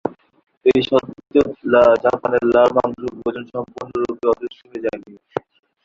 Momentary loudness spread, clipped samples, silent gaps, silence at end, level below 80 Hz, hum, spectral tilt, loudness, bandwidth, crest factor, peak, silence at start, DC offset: 16 LU; under 0.1%; 0.57-0.61 s; 0.45 s; -52 dBFS; none; -6.5 dB/octave; -18 LUFS; 7.4 kHz; 18 dB; -2 dBFS; 0.05 s; under 0.1%